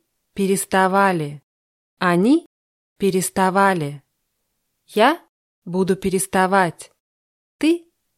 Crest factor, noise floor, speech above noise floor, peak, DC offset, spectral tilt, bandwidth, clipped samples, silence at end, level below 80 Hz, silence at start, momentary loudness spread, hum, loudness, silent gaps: 18 dB; -73 dBFS; 55 dB; -2 dBFS; under 0.1%; -5 dB/octave; 15.5 kHz; under 0.1%; 0.4 s; -58 dBFS; 0.35 s; 10 LU; none; -19 LUFS; 1.43-1.97 s, 2.46-2.96 s, 5.29-5.62 s, 7.00-7.59 s